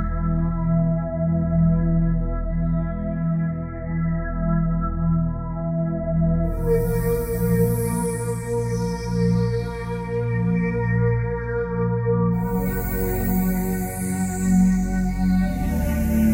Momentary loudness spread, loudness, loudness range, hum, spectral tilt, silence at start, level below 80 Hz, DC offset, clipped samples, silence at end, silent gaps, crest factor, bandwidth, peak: 6 LU; -23 LUFS; 2 LU; none; -8 dB/octave; 0 s; -30 dBFS; under 0.1%; under 0.1%; 0 s; none; 14 dB; 16 kHz; -8 dBFS